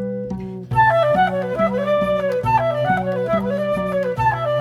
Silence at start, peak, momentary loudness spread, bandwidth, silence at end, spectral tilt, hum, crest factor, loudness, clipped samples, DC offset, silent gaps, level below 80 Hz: 0 s; -6 dBFS; 6 LU; 13 kHz; 0 s; -7.5 dB/octave; none; 14 dB; -19 LUFS; under 0.1%; under 0.1%; none; -44 dBFS